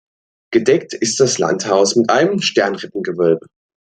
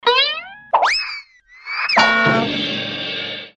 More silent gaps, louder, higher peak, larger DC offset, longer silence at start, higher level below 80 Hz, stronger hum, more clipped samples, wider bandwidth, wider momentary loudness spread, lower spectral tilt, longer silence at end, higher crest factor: neither; about the same, -16 LUFS vs -17 LUFS; about the same, 0 dBFS vs -2 dBFS; neither; first, 0.5 s vs 0.05 s; second, -62 dBFS vs -56 dBFS; neither; neither; second, 9.4 kHz vs 10.5 kHz; second, 6 LU vs 14 LU; about the same, -3.5 dB/octave vs -3.5 dB/octave; first, 0.55 s vs 0.05 s; about the same, 16 dB vs 16 dB